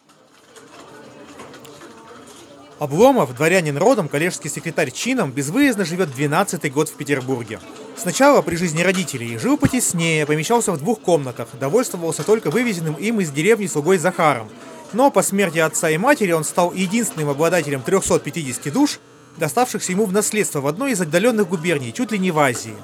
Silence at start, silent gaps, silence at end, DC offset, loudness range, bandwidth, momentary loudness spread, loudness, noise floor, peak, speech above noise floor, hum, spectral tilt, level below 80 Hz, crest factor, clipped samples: 0.55 s; none; 0 s; under 0.1%; 3 LU; 18.5 kHz; 9 LU; -19 LUFS; -51 dBFS; 0 dBFS; 32 dB; none; -4.5 dB/octave; -54 dBFS; 20 dB; under 0.1%